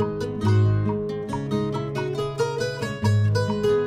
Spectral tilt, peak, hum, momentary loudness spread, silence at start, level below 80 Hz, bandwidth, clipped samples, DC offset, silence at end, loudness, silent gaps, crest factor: -7 dB/octave; -10 dBFS; none; 7 LU; 0 s; -48 dBFS; 11 kHz; under 0.1%; under 0.1%; 0 s; -24 LUFS; none; 14 dB